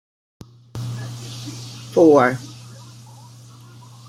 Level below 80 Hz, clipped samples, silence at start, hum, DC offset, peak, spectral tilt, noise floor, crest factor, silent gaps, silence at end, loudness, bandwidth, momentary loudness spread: -60 dBFS; under 0.1%; 0.75 s; none; under 0.1%; -2 dBFS; -6.5 dB/octave; -43 dBFS; 20 dB; none; 1.25 s; -18 LUFS; 15 kHz; 27 LU